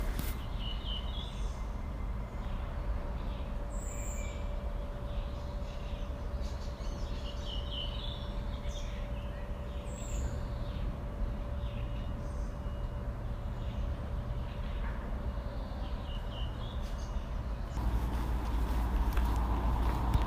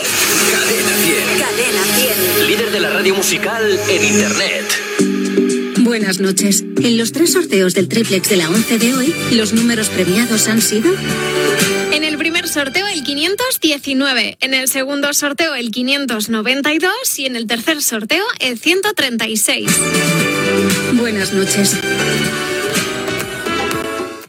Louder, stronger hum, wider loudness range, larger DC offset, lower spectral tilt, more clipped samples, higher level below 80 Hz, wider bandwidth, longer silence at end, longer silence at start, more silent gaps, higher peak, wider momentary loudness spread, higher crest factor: second, -39 LUFS vs -14 LUFS; neither; about the same, 4 LU vs 2 LU; neither; first, -6 dB/octave vs -3 dB/octave; neither; first, -36 dBFS vs -52 dBFS; second, 15.5 kHz vs 19 kHz; about the same, 0 s vs 0.05 s; about the same, 0 s vs 0 s; neither; second, -16 dBFS vs 0 dBFS; about the same, 7 LU vs 5 LU; about the same, 18 dB vs 16 dB